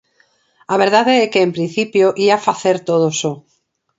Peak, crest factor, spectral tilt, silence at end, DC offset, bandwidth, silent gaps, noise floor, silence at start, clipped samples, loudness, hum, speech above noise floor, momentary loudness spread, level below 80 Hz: 0 dBFS; 16 dB; -4.5 dB/octave; 0.6 s; under 0.1%; 8 kHz; none; -58 dBFS; 0.7 s; under 0.1%; -15 LUFS; none; 44 dB; 8 LU; -64 dBFS